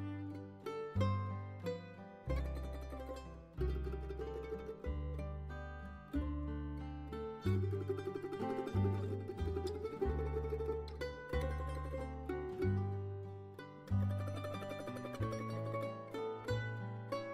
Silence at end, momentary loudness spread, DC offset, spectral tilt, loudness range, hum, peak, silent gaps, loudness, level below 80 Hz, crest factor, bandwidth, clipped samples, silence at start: 0 s; 10 LU; under 0.1%; -8 dB/octave; 4 LU; none; -24 dBFS; none; -42 LUFS; -48 dBFS; 16 dB; 13 kHz; under 0.1%; 0 s